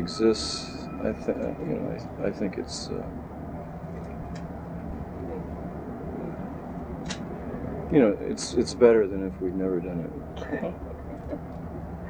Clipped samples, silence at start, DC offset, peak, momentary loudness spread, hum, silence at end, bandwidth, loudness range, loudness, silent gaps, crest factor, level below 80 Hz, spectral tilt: under 0.1%; 0 s; under 0.1%; -6 dBFS; 15 LU; none; 0 s; 10.5 kHz; 11 LU; -29 LUFS; none; 24 dB; -44 dBFS; -6 dB/octave